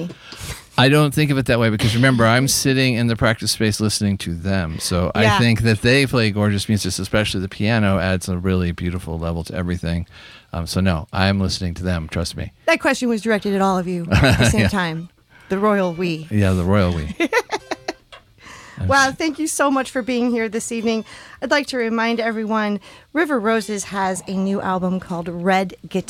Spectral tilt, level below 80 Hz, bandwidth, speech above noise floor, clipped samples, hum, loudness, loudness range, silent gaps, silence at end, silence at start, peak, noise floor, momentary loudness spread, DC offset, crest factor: -5 dB/octave; -40 dBFS; 16.5 kHz; 27 dB; under 0.1%; none; -19 LUFS; 5 LU; none; 0.05 s; 0 s; -4 dBFS; -46 dBFS; 11 LU; under 0.1%; 14 dB